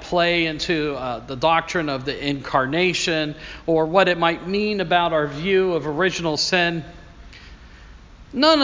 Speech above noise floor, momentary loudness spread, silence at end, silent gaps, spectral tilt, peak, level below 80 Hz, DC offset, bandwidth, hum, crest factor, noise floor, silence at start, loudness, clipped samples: 23 dB; 8 LU; 0 s; none; -4.5 dB/octave; -2 dBFS; -46 dBFS; under 0.1%; 7.6 kHz; none; 20 dB; -43 dBFS; 0 s; -21 LUFS; under 0.1%